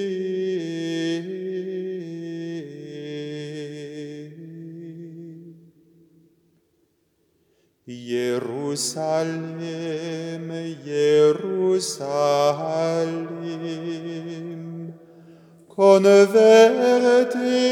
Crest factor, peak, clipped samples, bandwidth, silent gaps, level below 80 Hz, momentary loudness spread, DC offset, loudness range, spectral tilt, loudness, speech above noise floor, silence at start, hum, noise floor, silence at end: 20 dB; -2 dBFS; under 0.1%; 15 kHz; none; -80 dBFS; 23 LU; under 0.1%; 20 LU; -5 dB/octave; -21 LUFS; 48 dB; 0 s; none; -67 dBFS; 0 s